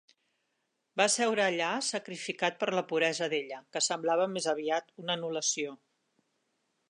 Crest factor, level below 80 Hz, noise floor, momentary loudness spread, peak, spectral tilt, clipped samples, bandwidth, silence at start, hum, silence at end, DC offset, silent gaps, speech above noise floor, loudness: 22 dB; -86 dBFS; -80 dBFS; 8 LU; -10 dBFS; -2 dB/octave; under 0.1%; 11.5 kHz; 0.95 s; none; 1.15 s; under 0.1%; none; 49 dB; -31 LUFS